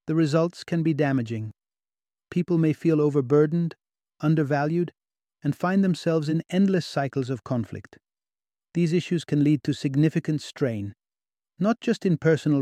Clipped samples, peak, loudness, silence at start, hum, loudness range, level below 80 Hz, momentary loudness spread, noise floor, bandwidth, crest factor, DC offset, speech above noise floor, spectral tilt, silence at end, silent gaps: under 0.1%; -8 dBFS; -25 LUFS; 0.05 s; none; 2 LU; -66 dBFS; 10 LU; under -90 dBFS; 10.5 kHz; 16 dB; under 0.1%; over 67 dB; -7.5 dB/octave; 0 s; none